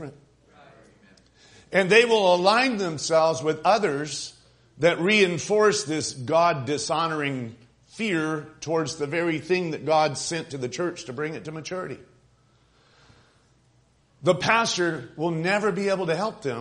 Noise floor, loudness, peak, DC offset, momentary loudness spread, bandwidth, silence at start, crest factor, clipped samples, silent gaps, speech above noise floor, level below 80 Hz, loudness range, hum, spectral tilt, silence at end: -62 dBFS; -24 LUFS; -4 dBFS; under 0.1%; 13 LU; 10.5 kHz; 0 s; 22 dB; under 0.1%; none; 38 dB; -64 dBFS; 11 LU; none; -4 dB/octave; 0 s